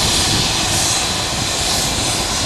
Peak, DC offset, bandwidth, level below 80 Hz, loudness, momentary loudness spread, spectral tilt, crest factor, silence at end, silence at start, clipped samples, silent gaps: -2 dBFS; under 0.1%; 16.5 kHz; -32 dBFS; -15 LUFS; 4 LU; -2 dB/octave; 14 dB; 0 s; 0 s; under 0.1%; none